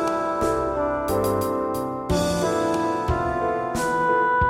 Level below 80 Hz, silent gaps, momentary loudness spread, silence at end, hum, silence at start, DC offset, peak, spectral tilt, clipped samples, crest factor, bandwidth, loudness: -38 dBFS; none; 4 LU; 0 s; none; 0 s; under 0.1%; -8 dBFS; -5.5 dB/octave; under 0.1%; 14 dB; 17 kHz; -23 LUFS